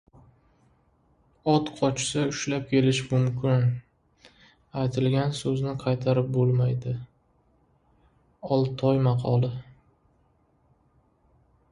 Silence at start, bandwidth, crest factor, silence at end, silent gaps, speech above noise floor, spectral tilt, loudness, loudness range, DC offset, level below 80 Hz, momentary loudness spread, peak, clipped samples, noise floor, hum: 1.45 s; 10.5 kHz; 20 dB; 2 s; none; 41 dB; -6.5 dB/octave; -26 LUFS; 3 LU; under 0.1%; -58 dBFS; 8 LU; -8 dBFS; under 0.1%; -65 dBFS; none